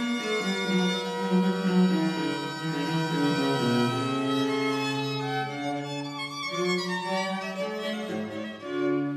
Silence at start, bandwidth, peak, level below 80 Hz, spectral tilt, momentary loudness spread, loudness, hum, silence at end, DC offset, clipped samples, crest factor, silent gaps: 0 s; 14.5 kHz; -12 dBFS; -74 dBFS; -5.5 dB/octave; 8 LU; -28 LUFS; none; 0 s; under 0.1%; under 0.1%; 16 dB; none